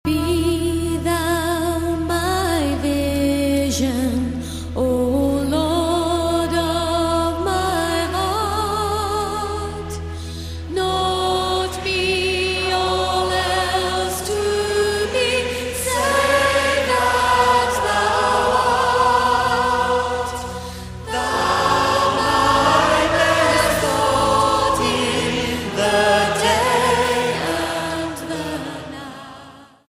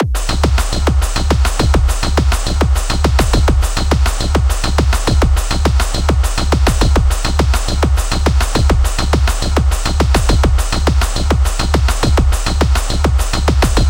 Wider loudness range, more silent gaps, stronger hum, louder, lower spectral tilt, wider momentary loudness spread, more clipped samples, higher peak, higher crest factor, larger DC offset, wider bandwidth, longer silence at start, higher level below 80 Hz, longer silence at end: first, 5 LU vs 0 LU; neither; neither; second, -19 LUFS vs -15 LUFS; about the same, -4 dB/octave vs -5 dB/octave; first, 10 LU vs 2 LU; neither; about the same, -2 dBFS vs 0 dBFS; about the same, 16 dB vs 12 dB; second, under 0.1% vs 0.4%; about the same, 15.5 kHz vs 16.5 kHz; about the same, 0.05 s vs 0 s; second, -36 dBFS vs -14 dBFS; first, 0.3 s vs 0 s